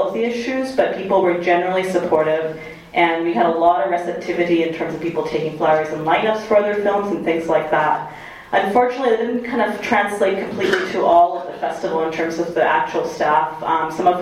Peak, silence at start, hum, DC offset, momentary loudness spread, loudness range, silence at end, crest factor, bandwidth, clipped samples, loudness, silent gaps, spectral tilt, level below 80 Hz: 0 dBFS; 0 s; none; under 0.1%; 7 LU; 1 LU; 0 s; 18 dB; 15 kHz; under 0.1%; -18 LUFS; none; -5.5 dB/octave; -54 dBFS